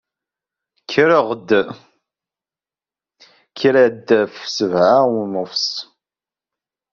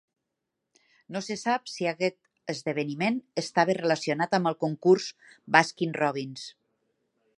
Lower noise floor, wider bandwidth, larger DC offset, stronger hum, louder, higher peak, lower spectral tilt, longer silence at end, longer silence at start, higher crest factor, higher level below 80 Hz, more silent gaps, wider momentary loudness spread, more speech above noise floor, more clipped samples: first, under -90 dBFS vs -84 dBFS; second, 7.4 kHz vs 11 kHz; neither; neither; first, -16 LUFS vs -27 LUFS; about the same, -2 dBFS vs -2 dBFS; second, -3 dB/octave vs -5 dB/octave; first, 1.1 s vs 0.9 s; second, 0.9 s vs 1.1 s; second, 18 dB vs 26 dB; first, -64 dBFS vs -76 dBFS; neither; second, 9 LU vs 14 LU; first, over 74 dB vs 57 dB; neither